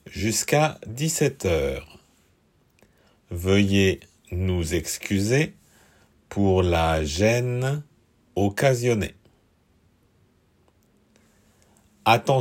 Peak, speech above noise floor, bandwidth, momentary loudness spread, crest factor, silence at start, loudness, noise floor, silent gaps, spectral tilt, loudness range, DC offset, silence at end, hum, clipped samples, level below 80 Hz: -4 dBFS; 41 dB; 16.5 kHz; 11 LU; 22 dB; 0.05 s; -23 LUFS; -63 dBFS; none; -5 dB/octave; 5 LU; under 0.1%; 0 s; none; under 0.1%; -46 dBFS